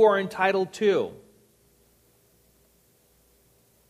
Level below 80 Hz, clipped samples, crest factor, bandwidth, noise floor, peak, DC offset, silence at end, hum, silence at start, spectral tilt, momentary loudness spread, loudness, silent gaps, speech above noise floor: -70 dBFS; under 0.1%; 20 dB; 14.5 kHz; -63 dBFS; -8 dBFS; under 0.1%; 2.75 s; none; 0 s; -5 dB/octave; 5 LU; -24 LUFS; none; 40 dB